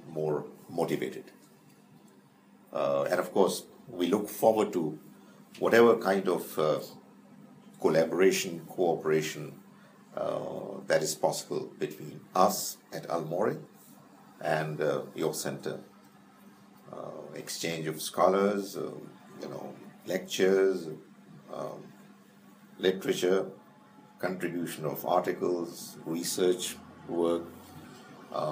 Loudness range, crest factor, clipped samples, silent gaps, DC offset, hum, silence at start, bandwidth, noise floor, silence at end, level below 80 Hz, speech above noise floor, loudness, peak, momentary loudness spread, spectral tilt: 7 LU; 24 dB; under 0.1%; none; under 0.1%; none; 0 s; 15.5 kHz; -59 dBFS; 0 s; -80 dBFS; 29 dB; -30 LUFS; -8 dBFS; 18 LU; -4.5 dB/octave